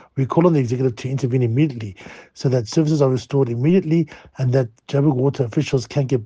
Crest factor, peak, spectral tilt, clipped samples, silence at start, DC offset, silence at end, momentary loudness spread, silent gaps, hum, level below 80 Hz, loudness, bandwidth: 18 dB; -2 dBFS; -8 dB/octave; under 0.1%; 0.15 s; under 0.1%; 0 s; 8 LU; none; none; -56 dBFS; -19 LUFS; 8 kHz